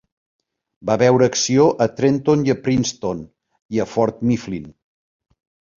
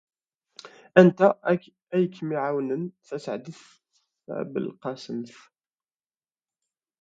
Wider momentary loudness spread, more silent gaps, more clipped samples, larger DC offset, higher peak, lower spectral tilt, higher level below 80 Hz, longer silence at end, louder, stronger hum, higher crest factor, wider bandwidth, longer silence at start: second, 12 LU vs 18 LU; first, 3.62-3.69 s vs none; neither; neither; about the same, -2 dBFS vs 0 dBFS; second, -5.5 dB/octave vs -8 dB/octave; first, -52 dBFS vs -72 dBFS; second, 1.1 s vs 1.75 s; first, -18 LUFS vs -25 LUFS; neither; second, 18 dB vs 26 dB; about the same, 7.6 kHz vs 7.8 kHz; first, 0.85 s vs 0.65 s